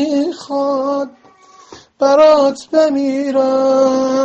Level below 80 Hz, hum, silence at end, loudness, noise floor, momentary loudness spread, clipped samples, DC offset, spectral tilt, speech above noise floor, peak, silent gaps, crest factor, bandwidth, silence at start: -60 dBFS; none; 0 s; -14 LUFS; -45 dBFS; 10 LU; under 0.1%; under 0.1%; -4.5 dB/octave; 32 dB; 0 dBFS; none; 14 dB; 8.4 kHz; 0 s